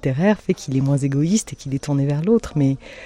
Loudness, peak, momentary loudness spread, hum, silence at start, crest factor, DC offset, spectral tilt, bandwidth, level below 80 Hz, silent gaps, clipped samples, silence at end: -20 LUFS; -6 dBFS; 4 LU; none; 0.05 s; 14 dB; under 0.1%; -6.5 dB/octave; 11 kHz; -46 dBFS; none; under 0.1%; 0 s